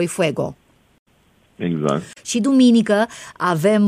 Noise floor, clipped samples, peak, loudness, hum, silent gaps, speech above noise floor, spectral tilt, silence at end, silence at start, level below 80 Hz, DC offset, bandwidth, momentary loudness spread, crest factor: -57 dBFS; under 0.1%; -4 dBFS; -19 LUFS; none; 0.99-1.06 s; 40 dB; -5.5 dB/octave; 0 s; 0 s; -60 dBFS; under 0.1%; 15 kHz; 12 LU; 14 dB